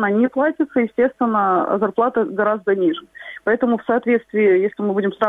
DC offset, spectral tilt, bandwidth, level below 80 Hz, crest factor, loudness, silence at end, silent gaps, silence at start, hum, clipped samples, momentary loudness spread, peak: under 0.1%; -8.5 dB/octave; 3.9 kHz; -62 dBFS; 14 dB; -18 LUFS; 0 s; none; 0 s; none; under 0.1%; 4 LU; -4 dBFS